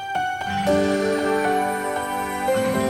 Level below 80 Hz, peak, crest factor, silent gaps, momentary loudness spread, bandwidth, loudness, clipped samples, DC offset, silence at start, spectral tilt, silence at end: -50 dBFS; -8 dBFS; 14 dB; none; 5 LU; 17 kHz; -22 LUFS; under 0.1%; under 0.1%; 0 s; -4.5 dB/octave; 0 s